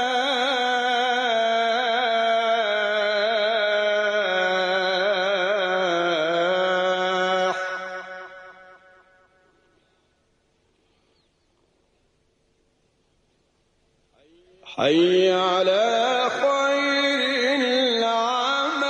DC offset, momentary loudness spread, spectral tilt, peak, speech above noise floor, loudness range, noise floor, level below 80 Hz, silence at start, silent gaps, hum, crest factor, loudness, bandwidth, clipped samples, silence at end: under 0.1%; 3 LU; -3 dB/octave; -10 dBFS; 48 dB; 8 LU; -66 dBFS; -72 dBFS; 0 s; none; none; 14 dB; -21 LUFS; 10 kHz; under 0.1%; 0 s